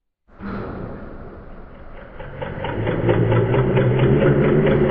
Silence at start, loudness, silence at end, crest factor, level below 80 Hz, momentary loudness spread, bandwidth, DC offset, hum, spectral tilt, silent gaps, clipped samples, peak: 0.4 s; -18 LUFS; 0 s; 16 dB; -36 dBFS; 23 LU; 4.2 kHz; under 0.1%; none; -12 dB/octave; none; under 0.1%; -4 dBFS